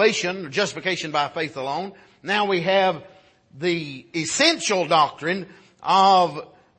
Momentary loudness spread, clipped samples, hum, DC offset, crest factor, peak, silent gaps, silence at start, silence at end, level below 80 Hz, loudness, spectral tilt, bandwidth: 13 LU; under 0.1%; none; under 0.1%; 20 dB; -2 dBFS; none; 0 s; 0.35 s; -68 dBFS; -21 LUFS; -3 dB/octave; 8.8 kHz